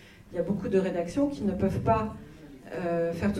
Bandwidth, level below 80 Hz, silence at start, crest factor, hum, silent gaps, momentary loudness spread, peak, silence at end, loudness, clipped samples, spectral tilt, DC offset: 13 kHz; -48 dBFS; 0 s; 18 dB; none; none; 14 LU; -12 dBFS; 0 s; -29 LUFS; under 0.1%; -8 dB/octave; under 0.1%